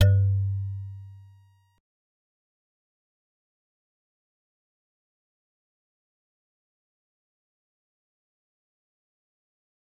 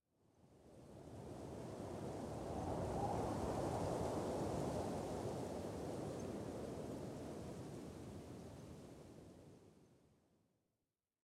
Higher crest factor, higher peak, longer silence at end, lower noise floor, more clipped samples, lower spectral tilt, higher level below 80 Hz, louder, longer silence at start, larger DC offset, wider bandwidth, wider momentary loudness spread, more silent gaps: first, 26 dB vs 18 dB; first, -6 dBFS vs -30 dBFS; first, 8.8 s vs 1.3 s; second, -58 dBFS vs under -90 dBFS; neither; about the same, -7 dB/octave vs -6.5 dB/octave; about the same, -60 dBFS vs -62 dBFS; first, -26 LUFS vs -46 LUFS; second, 0 s vs 0.45 s; neither; second, 5.8 kHz vs 16.5 kHz; first, 23 LU vs 17 LU; neither